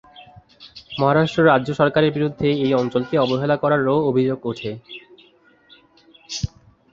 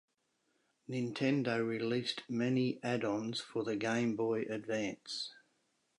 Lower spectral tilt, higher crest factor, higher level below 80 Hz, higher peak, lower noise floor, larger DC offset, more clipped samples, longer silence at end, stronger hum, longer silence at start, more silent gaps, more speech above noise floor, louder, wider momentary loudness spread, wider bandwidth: about the same, -6.5 dB/octave vs -5.5 dB/octave; about the same, 20 dB vs 18 dB; first, -50 dBFS vs -80 dBFS; first, -2 dBFS vs -20 dBFS; second, -54 dBFS vs -79 dBFS; neither; neither; second, 0.45 s vs 0.65 s; neither; second, 0.15 s vs 0.9 s; neither; second, 36 dB vs 44 dB; first, -19 LUFS vs -36 LUFS; first, 15 LU vs 7 LU; second, 7.8 kHz vs 11 kHz